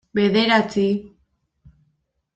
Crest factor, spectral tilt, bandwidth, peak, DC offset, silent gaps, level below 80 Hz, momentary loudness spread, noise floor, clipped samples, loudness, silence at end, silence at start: 18 dB; -6 dB/octave; 8.2 kHz; -4 dBFS; under 0.1%; none; -58 dBFS; 7 LU; -70 dBFS; under 0.1%; -19 LUFS; 1.3 s; 0.15 s